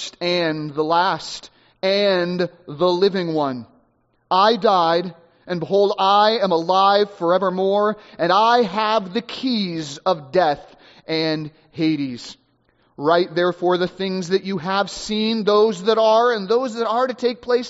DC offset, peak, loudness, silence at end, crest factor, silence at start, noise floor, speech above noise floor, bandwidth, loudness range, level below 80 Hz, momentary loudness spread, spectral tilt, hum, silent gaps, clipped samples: under 0.1%; -2 dBFS; -19 LUFS; 0 s; 18 dB; 0 s; -63 dBFS; 44 dB; 8 kHz; 5 LU; -60 dBFS; 10 LU; -3 dB/octave; none; none; under 0.1%